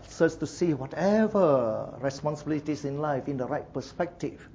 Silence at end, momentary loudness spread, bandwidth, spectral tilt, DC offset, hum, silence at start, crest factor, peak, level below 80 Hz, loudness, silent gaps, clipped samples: 0.05 s; 10 LU; 8 kHz; -7 dB/octave; under 0.1%; none; 0 s; 18 dB; -10 dBFS; -56 dBFS; -28 LUFS; none; under 0.1%